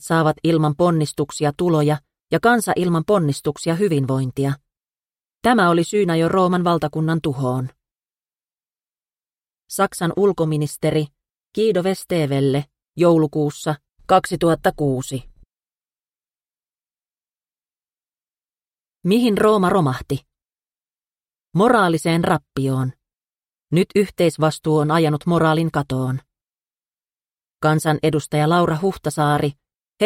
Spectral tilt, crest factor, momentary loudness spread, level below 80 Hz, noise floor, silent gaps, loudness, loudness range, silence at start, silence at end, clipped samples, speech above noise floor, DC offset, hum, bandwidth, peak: -6.5 dB/octave; 18 dB; 10 LU; -52 dBFS; under -90 dBFS; 18.81-18.85 s; -19 LUFS; 5 LU; 0 s; 0 s; under 0.1%; over 72 dB; under 0.1%; none; 16 kHz; -2 dBFS